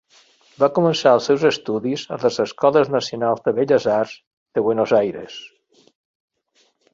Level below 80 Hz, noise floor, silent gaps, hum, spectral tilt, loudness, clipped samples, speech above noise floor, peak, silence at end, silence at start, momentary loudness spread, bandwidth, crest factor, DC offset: -64 dBFS; -63 dBFS; 4.27-4.46 s; none; -5.5 dB/octave; -19 LUFS; under 0.1%; 44 dB; -2 dBFS; 1.45 s; 0.6 s; 10 LU; 7.6 kHz; 18 dB; under 0.1%